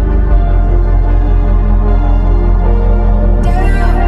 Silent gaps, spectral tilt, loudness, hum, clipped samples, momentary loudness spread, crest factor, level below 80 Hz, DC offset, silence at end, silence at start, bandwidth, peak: none; -9 dB/octave; -13 LUFS; none; under 0.1%; 0 LU; 8 dB; -8 dBFS; under 0.1%; 0 s; 0 s; 4.1 kHz; 0 dBFS